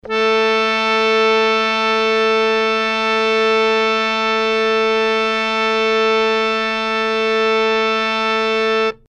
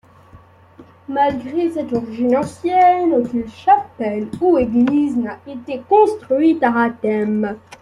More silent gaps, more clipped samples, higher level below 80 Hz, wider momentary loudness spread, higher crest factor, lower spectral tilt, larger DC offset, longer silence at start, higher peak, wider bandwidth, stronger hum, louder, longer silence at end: neither; neither; about the same, -52 dBFS vs -52 dBFS; second, 2 LU vs 10 LU; about the same, 14 dB vs 16 dB; second, -3 dB/octave vs -7 dB/octave; neither; second, 0.05 s vs 0.35 s; about the same, -4 dBFS vs -2 dBFS; second, 9 kHz vs 11.5 kHz; neither; about the same, -15 LUFS vs -17 LUFS; about the same, 0.15 s vs 0.05 s